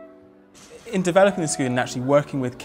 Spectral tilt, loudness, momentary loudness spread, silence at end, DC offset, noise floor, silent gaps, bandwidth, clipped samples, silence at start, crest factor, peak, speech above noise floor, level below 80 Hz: -5 dB/octave; -21 LUFS; 9 LU; 0 s; under 0.1%; -49 dBFS; none; 16 kHz; under 0.1%; 0 s; 18 dB; -4 dBFS; 28 dB; -58 dBFS